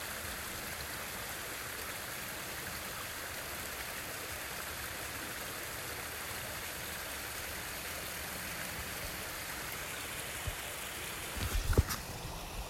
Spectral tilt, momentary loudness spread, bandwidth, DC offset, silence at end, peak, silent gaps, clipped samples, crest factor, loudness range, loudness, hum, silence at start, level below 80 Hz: -2.5 dB/octave; 2 LU; 16 kHz; under 0.1%; 0 s; -14 dBFS; none; under 0.1%; 26 dB; 2 LU; -39 LUFS; none; 0 s; -48 dBFS